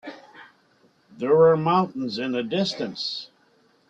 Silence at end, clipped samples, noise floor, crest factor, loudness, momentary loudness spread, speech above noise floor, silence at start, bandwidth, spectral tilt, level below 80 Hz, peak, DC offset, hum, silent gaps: 0.65 s; under 0.1%; -61 dBFS; 18 dB; -23 LUFS; 14 LU; 39 dB; 0.05 s; 7.8 kHz; -6 dB/octave; -66 dBFS; -6 dBFS; under 0.1%; none; none